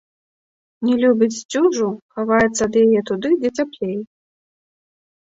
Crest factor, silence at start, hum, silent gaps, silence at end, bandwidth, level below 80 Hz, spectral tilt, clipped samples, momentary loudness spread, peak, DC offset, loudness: 16 dB; 0.8 s; none; 1.45-1.49 s, 2.02-2.09 s; 1.15 s; 8 kHz; -56 dBFS; -5 dB/octave; under 0.1%; 10 LU; -4 dBFS; under 0.1%; -18 LUFS